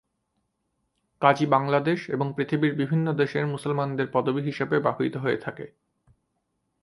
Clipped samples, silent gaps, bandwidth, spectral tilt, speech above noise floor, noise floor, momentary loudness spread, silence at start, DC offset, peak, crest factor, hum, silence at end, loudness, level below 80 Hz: under 0.1%; none; 11.5 kHz; -7.5 dB/octave; 52 dB; -76 dBFS; 7 LU; 1.2 s; under 0.1%; -4 dBFS; 22 dB; none; 1.15 s; -25 LUFS; -68 dBFS